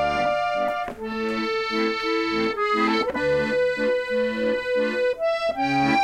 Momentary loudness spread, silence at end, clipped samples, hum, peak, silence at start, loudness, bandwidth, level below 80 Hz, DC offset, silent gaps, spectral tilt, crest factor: 4 LU; 0 s; under 0.1%; none; -8 dBFS; 0 s; -23 LUFS; 12.5 kHz; -52 dBFS; under 0.1%; none; -5 dB/octave; 14 dB